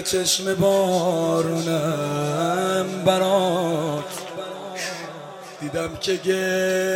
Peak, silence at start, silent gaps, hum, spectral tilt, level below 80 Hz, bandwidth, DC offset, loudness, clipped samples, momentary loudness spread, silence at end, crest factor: -6 dBFS; 0 s; none; none; -4 dB/octave; -58 dBFS; 16.5 kHz; under 0.1%; -22 LUFS; under 0.1%; 13 LU; 0 s; 18 dB